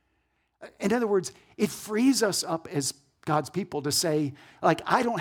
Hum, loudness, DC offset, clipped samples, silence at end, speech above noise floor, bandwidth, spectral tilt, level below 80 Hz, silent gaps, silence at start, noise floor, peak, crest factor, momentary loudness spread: none; -27 LUFS; under 0.1%; under 0.1%; 0 s; 46 dB; 19.5 kHz; -4 dB/octave; -68 dBFS; none; 0.6 s; -73 dBFS; -6 dBFS; 22 dB; 9 LU